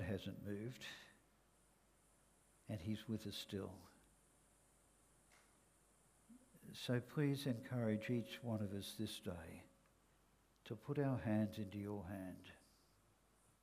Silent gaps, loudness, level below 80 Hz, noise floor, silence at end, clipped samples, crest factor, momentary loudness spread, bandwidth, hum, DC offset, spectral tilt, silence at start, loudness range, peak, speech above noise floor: none; -46 LUFS; -74 dBFS; -75 dBFS; 1.05 s; under 0.1%; 20 dB; 18 LU; 15.5 kHz; none; under 0.1%; -6.5 dB/octave; 0 s; 8 LU; -28 dBFS; 30 dB